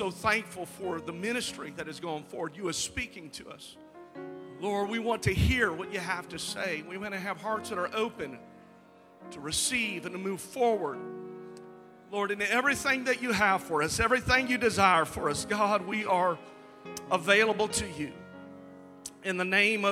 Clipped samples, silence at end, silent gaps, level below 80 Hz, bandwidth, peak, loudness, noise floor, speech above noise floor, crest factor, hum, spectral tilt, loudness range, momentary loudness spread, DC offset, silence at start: under 0.1%; 0 s; none; -48 dBFS; 16.5 kHz; -8 dBFS; -29 LUFS; -56 dBFS; 26 dB; 22 dB; none; -3.5 dB/octave; 9 LU; 20 LU; under 0.1%; 0 s